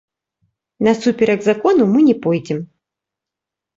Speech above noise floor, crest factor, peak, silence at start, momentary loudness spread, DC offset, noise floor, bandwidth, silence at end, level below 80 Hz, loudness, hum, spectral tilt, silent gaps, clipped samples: 70 dB; 14 dB; -2 dBFS; 0.8 s; 8 LU; under 0.1%; -85 dBFS; 7.8 kHz; 1.1 s; -60 dBFS; -16 LUFS; none; -7 dB/octave; none; under 0.1%